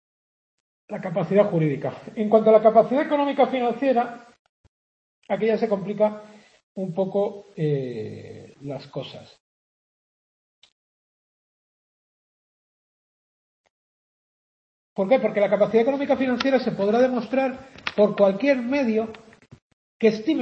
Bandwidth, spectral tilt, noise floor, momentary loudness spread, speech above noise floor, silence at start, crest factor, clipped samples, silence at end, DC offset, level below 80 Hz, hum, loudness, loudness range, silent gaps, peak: 8 kHz; -7.5 dB/octave; under -90 dBFS; 16 LU; over 68 dB; 0.9 s; 20 dB; under 0.1%; 0 s; under 0.1%; -68 dBFS; none; -22 LUFS; 12 LU; 4.39-5.22 s, 6.63-6.75 s, 9.40-10.62 s, 10.72-13.64 s, 13.70-14.96 s, 19.62-20.00 s; -4 dBFS